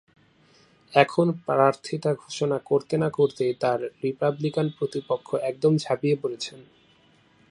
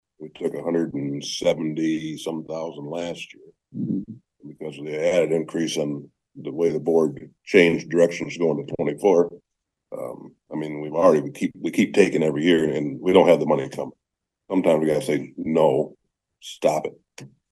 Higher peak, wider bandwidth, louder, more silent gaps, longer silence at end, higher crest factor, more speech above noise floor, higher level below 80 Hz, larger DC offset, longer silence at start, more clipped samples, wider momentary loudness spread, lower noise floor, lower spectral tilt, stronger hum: about the same, -2 dBFS vs -2 dBFS; about the same, 11.5 kHz vs 12.5 kHz; second, -25 LUFS vs -22 LUFS; neither; first, 0.9 s vs 0.25 s; about the same, 24 dB vs 22 dB; second, 35 dB vs 60 dB; second, -70 dBFS vs -64 dBFS; neither; first, 0.9 s vs 0.2 s; neither; second, 7 LU vs 17 LU; second, -59 dBFS vs -81 dBFS; about the same, -6.5 dB/octave vs -5.5 dB/octave; neither